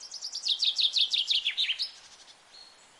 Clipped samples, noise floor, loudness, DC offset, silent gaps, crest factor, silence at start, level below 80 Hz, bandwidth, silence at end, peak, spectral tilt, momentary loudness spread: under 0.1%; -54 dBFS; -26 LUFS; under 0.1%; none; 18 dB; 0 s; -80 dBFS; 11.5 kHz; 0.35 s; -12 dBFS; 4.5 dB/octave; 9 LU